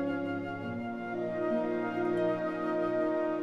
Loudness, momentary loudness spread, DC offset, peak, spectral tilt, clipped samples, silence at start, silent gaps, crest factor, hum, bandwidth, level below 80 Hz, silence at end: -33 LUFS; 7 LU; 0.1%; -20 dBFS; -8 dB/octave; under 0.1%; 0 s; none; 12 dB; none; 7.4 kHz; -66 dBFS; 0 s